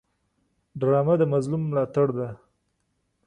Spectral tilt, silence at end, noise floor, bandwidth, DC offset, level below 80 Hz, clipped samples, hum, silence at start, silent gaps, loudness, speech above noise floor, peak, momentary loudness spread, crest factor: -9.5 dB/octave; 0.9 s; -74 dBFS; 10 kHz; under 0.1%; -62 dBFS; under 0.1%; none; 0.75 s; none; -24 LUFS; 51 dB; -10 dBFS; 12 LU; 16 dB